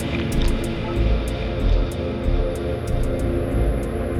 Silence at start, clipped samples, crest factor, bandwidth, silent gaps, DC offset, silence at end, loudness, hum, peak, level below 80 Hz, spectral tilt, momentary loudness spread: 0 s; under 0.1%; 14 dB; 13.5 kHz; none; under 0.1%; 0 s; -24 LUFS; none; -8 dBFS; -24 dBFS; -7 dB/octave; 3 LU